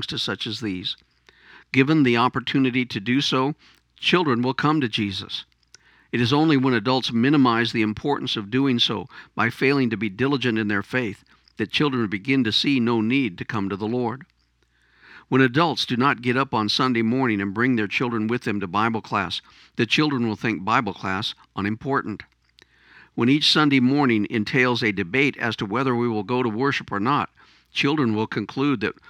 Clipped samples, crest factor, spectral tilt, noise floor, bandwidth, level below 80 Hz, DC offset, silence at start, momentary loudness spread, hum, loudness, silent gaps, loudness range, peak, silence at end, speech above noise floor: under 0.1%; 20 dB; -5.5 dB/octave; -65 dBFS; 11.5 kHz; -62 dBFS; under 0.1%; 0 s; 9 LU; none; -22 LUFS; none; 3 LU; -2 dBFS; 0.2 s; 43 dB